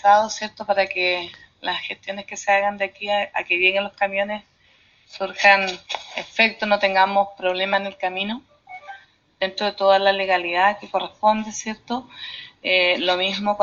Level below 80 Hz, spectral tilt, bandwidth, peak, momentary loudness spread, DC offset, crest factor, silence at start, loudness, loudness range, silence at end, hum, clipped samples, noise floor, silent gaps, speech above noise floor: -62 dBFS; 0 dB/octave; 7.4 kHz; 0 dBFS; 14 LU; under 0.1%; 20 dB; 0.05 s; -21 LUFS; 3 LU; 0 s; none; under 0.1%; -57 dBFS; none; 36 dB